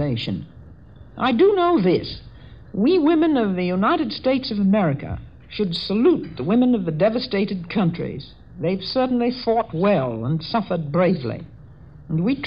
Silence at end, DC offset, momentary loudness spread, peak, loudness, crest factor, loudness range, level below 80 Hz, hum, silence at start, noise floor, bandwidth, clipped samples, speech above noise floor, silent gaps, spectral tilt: 0 s; 0.3%; 14 LU; -8 dBFS; -21 LUFS; 14 dB; 3 LU; -48 dBFS; none; 0 s; -44 dBFS; 7.6 kHz; under 0.1%; 24 dB; none; -9 dB/octave